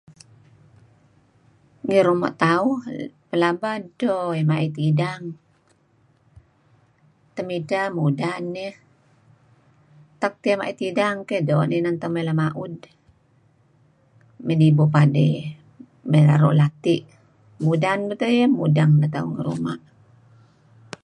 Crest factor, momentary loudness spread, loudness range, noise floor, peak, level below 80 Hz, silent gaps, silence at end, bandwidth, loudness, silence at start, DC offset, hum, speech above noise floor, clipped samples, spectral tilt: 20 dB; 16 LU; 9 LU; -61 dBFS; -2 dBFS; -64 dBFS; none; 1.25 s; 9.8 kHz; -21 LUFS; 1.85 s; under 0.1%; none; 41 dB; under 0.1%; -8 dB/octave